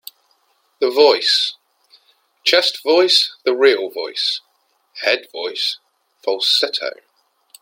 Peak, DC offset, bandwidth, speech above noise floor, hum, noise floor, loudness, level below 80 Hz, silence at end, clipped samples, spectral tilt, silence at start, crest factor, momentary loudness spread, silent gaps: 0 dBFS; under 0.1%; 16.5 kHz; 47 dB; none; -63 dBFS; -16 LUFS; -76 dBFS; 0.7 s; under 0.1%; -0.5 dB/octave; 0.8 s; 20 dB; 12 LU; none